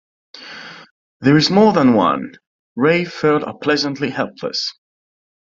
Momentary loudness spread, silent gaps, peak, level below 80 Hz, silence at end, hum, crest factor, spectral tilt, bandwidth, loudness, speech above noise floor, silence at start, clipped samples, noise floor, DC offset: 22 LU; 0.91-1.20 s, 2.47-2.76 s; 0 dBFS; -58 dBFS; 0.8 s; none; 18 dB; -5.5 dB/octave; 7.6 kHz; -16 LUFS; 20 dB; 0.35 s; under 0.1%; -36 dBFS; under 0.1%